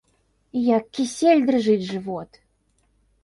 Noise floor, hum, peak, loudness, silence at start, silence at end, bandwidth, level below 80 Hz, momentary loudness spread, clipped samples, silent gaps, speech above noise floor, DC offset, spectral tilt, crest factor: -66 dBFS; none; -6 dBFS; -21 LUFS; 0.55 s; 1 s; 11.5 kHz; -64 dBFS; 13 LU; under 0.1%; none; 45 dB; under 0.1%; -5.5 dB/octave; 16 dB